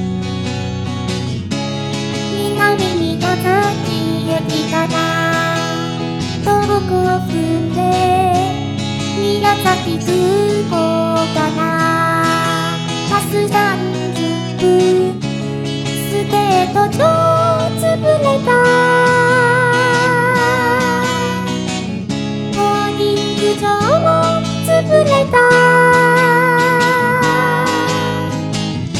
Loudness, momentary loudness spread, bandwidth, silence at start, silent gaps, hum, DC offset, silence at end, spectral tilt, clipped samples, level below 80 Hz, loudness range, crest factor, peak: -14 LUFS; 9 LU; 17.5 kHz; 0 s; none; none; under 0.1%; 0 s; -5 dB/octave; under 0.1%; -44 dBFS; 5 LU; 14 dB; 0 dBFS